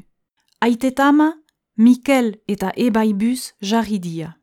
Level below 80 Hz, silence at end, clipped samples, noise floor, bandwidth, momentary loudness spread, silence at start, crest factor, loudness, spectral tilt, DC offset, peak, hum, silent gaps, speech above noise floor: -56 dBFS; 0.1 s; under 0.1%; -67 dBFS; 16 kHz; 10 LU; 0.6 s; 16 dB; -18 LUFS; -5.5 dB/octave; under 0.1%; -2 dBFS; none; none; 50 dB